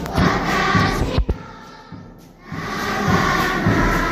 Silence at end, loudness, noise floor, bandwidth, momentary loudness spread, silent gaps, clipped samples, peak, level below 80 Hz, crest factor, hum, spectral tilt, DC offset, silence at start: 0 s; -19 LUFS; -41 dBFS; 16 kHz; 21 LU; none; under 0.1%; -2 dBFS; -30 dBFS; 16 dB; none; -5.5 dB/octave; under 0.1%; 0 s